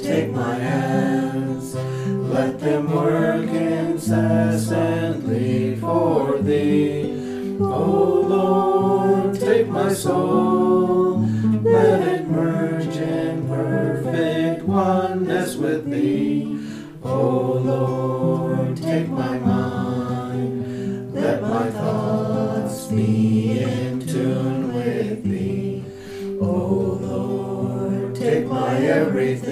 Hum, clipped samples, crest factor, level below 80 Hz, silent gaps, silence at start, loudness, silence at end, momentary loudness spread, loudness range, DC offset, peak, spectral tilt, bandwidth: none; under 0.1%; 16 dB; -56 dBFS; none; 0 s; -21 LUFS; 0 s; 7 LU; 5 LU; under 0.1%; -4 dBFS; -7.5 dB/octave; 15.5 kHz